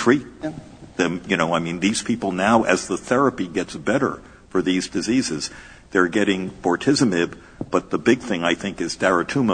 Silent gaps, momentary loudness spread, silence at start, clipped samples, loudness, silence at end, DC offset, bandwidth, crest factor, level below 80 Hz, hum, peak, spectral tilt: none; 9 LU; 0 s; under 0.1%; -21 LUFS; 0 s; under 0.1%; 9.6 kHz; 20 dB; -50 dBFS; none; -2 dBFS; -4.5 dB/octave